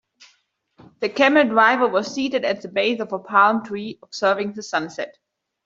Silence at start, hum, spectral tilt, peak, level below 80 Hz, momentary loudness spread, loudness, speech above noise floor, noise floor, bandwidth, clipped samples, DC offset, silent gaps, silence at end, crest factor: 1 s; none; -4 dB/octave; -2 dBFS; -68 dBFS; 15 LU; -20 LUFS; 44 dB; -64 dBFS; 7.8 kHz; under 0.1%; under 0.1%; none; 0.55 s; 20 dB